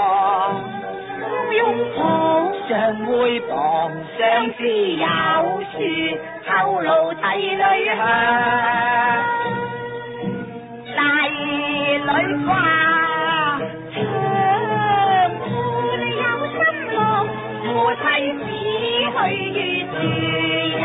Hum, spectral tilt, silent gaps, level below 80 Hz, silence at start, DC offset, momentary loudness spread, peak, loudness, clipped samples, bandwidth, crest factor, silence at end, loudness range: none; -10 dB/octave; none; -56 dBFS; 0 s; under 0.1%; 9 LU; -4 dBFS; -19 LUFS; under 0.1%; 4 kHz; 16 dB; 0 s; 2 LU